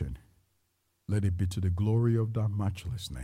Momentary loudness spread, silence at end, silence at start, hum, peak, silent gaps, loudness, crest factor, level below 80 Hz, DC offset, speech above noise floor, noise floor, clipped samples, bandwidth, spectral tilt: 12 LU; 0 s; 0 s; none; -16 dBFS; none; -30 LUFS; 14 dB; -48 dBFS; under 0.1%; 47 dB; -75 dBFS; under 0.1%; 13 kHz; -7.5 dB/octave